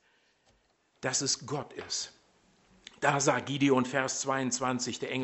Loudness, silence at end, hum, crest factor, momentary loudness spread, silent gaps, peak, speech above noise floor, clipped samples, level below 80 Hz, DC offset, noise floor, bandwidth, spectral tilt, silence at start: -30 LUFS; 0 s; none; 24 dB; 10 LU; none; -8 dBFS; 40 dB; under 0.1%; -70 dBFS; under 0.1%; -71 dBFS; 8.4 kHz; -3.5 dB/octave; 1 s